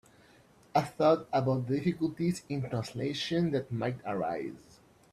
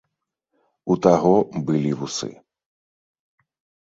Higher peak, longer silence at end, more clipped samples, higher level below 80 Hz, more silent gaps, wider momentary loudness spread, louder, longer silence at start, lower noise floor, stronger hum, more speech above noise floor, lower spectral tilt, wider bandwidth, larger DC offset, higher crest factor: second, -12 dBFS vs -2 dBFS; second, 0.55 s vs 1.5 s; neither; second, -66 dBFS vs -58 dBFS; neither; second, 9 LU vs 14 LU; second, -31 LUFS vs -20 LUFS; about the same, 0.75 s vs 0.85 s; second, -60 dBFS vs -79 dBFS; neither; second, 30 dB vs 60 dB; about the same, -6.5 dB/octave vs -6.5 dB/octave; first, 13.5 kHz vs 8 kHz; neither; about the same, 20 dB vs 22 dB